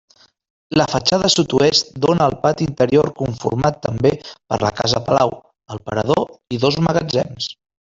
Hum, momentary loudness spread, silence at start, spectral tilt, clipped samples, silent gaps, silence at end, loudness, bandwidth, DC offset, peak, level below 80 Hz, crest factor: none; 10 LU; 0.7 s; -5 dB/octave; under 0.1%; none; 0.4 s; -18 LUFS; 8 kHz; under 0.1%; -2 dBFS; -46 dBFS; 16 dB